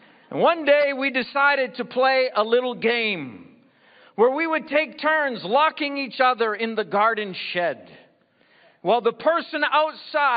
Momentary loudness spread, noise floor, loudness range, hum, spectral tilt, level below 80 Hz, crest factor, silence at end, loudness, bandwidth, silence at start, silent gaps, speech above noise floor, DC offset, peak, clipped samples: 7 LU; -60 dBFS; 4 LU; none; -8 dB/octave; -76 dBFS; 18 dB; 0 s; -22 LUFS; 5.2 kHz; 0.3 s; none; 38 dB; under 0.1%; -4 dBFS; under 0.1%